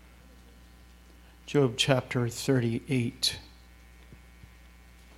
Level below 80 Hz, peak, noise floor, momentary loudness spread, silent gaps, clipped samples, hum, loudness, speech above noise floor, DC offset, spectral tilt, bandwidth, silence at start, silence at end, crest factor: -54 dBFS; -6 dBFS; -54 dBFS; 6 LU; none; under 0.1%; none; -28 LUFS; 26 dB; under 0.1%; -5 dB/octave; 16 kHz; 1.45 s; 1.05 s; 26 dB